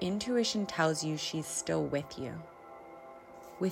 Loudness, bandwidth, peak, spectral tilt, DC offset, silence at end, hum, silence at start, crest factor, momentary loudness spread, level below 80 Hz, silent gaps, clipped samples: -33 LUFS; 16 kHz; -14 dBFS; -4 dB/octave; under 0.1%; 0 s; none; 0 s; 20 dB; 20 LU; -66 dBFS; none; under 0.1%